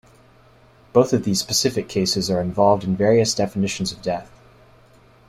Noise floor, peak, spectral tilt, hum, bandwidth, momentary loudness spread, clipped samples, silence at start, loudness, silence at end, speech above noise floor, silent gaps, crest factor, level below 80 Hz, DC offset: -52 dBFS; -2 dBFS; -4.5 dB/octave; none; 15.5 kHz; 7 LU; under 0.1%; 0.95 s; -20 LUFS; 1.05 s; 32 dB; none; 18 dB; -52 dBFS; under 0.1%